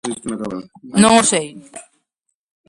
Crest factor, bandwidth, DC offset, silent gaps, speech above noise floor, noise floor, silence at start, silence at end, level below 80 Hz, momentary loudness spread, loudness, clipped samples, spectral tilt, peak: 18 dB; 11.5 kHz; under 0.1%; none; 58 dB; -75 dBFS; 0.05 s; 0.85 s; -54 dBFS; 20 LU; -15 LUFS; under 0.1%; -3.5 dB/octave; 0 dBFS